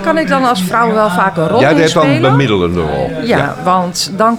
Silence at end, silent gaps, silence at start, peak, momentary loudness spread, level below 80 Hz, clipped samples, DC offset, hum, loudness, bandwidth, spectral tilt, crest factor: 0 s; none; 0 s; 0 dBFS; 5 LU; -38 dBFS; under 0.1%; under 0.1%; none; -11 LUFS; 17 kHz; -5.5 dB/octave; 12 dB